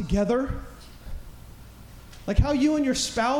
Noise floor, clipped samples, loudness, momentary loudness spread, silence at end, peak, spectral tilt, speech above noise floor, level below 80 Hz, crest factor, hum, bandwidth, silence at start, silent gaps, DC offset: -45 dBFS; under 0.1%; -24 LUFS; 25 LU; 0 s; -6 dBFS; -5 dB/octave; 22 dB; -34 dBFS; 20 dB; none; 18.5 kHz; 0 s; none; under 0.1%